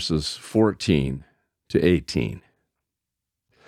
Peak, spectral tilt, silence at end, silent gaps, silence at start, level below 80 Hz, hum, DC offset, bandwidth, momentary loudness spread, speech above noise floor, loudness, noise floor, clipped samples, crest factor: -6 dBFS; -6 dB/octave; 1.3 s; none; 0 s; -44 dBFS; none; under 0.1%; 14.5 kHz; 11 LU; 62 dB; -23 LUFS; -85 dBFS; under 0.1%; 20 dB